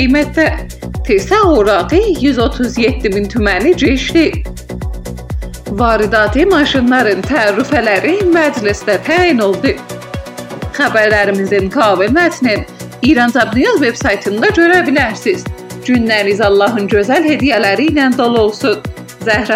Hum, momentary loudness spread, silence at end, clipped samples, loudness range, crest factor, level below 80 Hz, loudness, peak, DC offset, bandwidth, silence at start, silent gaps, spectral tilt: none; 14 LU; 0 s; under 0.1%; 2 LU; 12 dB; -28 dBFS; -12 LUFS; 0 dBFS; under 0.1%; 16 kHz; 0 s; none; -5.5 dB/octave